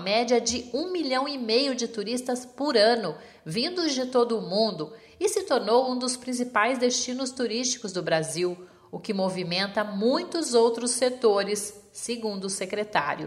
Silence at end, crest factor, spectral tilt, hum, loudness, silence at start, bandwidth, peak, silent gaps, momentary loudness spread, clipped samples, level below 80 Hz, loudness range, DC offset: 0 s; 20 dB; -3 dB/octave; none; -26 LUFS; 0 s; 14.5 kHz; -6 dBFS; none; 9 LU; under 0.1%; -66 dBFS; 2 LU; under 0.1%